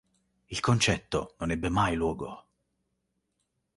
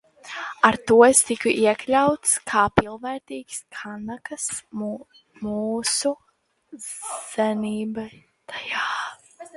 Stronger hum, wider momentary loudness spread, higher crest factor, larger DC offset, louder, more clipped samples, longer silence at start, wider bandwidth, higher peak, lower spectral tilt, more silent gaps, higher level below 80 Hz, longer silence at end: neither; second, 14 LU vs 18 LU; about the same, 22 dB vs 24 dB; neither; second, -29 LUFS vs -22 LUFS; neither; first, 0.5 s vs 0.25 s; about the same, 11.5 kHz vs 12 kHz; second, -10 dBFS vs 0 dBFS; first, -4.5 dB/octave vs -3 dB/octave; neither; about the same, -48 dBFS vs -52 dBFS; first, 1.4 s vs 0.1 s